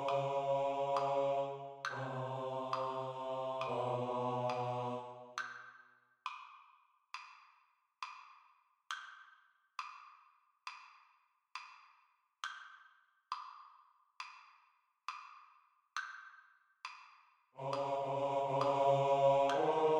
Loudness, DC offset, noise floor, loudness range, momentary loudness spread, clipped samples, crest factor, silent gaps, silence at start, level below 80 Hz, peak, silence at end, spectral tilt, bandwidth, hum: -38 LUFS; under 0.1%; -74 dBFS; 15 LU; 21 LU; under 0.1%; 20 dB; none; 0 s; -86 dBFS; -18 dBFS; 0 s; -5.5 dB/octave; 9.6 kHz; none